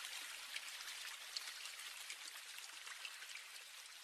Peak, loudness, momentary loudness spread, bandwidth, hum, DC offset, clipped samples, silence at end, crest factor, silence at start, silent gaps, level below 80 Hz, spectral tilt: -26 dBFS; -49 LUFS; 4 LU; 16 kHz; none; under 0.1%; under 0.1%; 0 s; 26 dB; 0 s; none; under -90 dBFS; 4.5 dB/octave